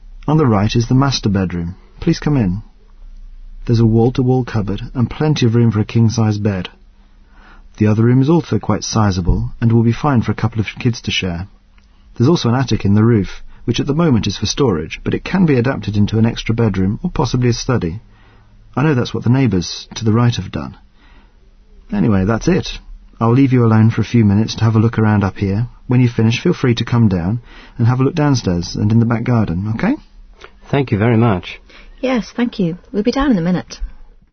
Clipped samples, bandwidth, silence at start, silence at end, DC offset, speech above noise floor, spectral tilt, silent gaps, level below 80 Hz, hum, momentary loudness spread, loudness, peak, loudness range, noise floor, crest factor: under 0.1%; 6.6 kHz; 0 s; 0.3 s; under 0.1%; 32 dB; -7 dB/octave; none; -34 dBFS; none; 9 LU; -16 LUFS; -2 dBFS; 4 LU; -46 dBFS; 14 dB